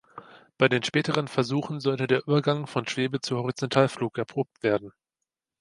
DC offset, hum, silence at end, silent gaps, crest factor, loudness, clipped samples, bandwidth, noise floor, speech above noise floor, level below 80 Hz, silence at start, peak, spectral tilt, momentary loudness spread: under 0.1%; none; 0.7 s; none; 22 dB; -26 LUFS; under 0.1%; 11.5 kHz; -87 dBFS; 61 dB; -66 dBFS; 0.15 s; -4 dBFS; -5.5 dB/octave; 6 LU